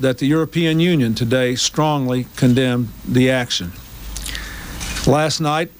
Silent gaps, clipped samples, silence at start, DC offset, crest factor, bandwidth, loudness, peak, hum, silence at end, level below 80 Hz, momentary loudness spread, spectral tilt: none; under 0.1%; 0 s; under 0.1%; 14 dB; 16.5 kHz; -18 LUFS; -4 dBFS; none; 0.1 s; -36 dBFS; 13 LU; -5 dB/octave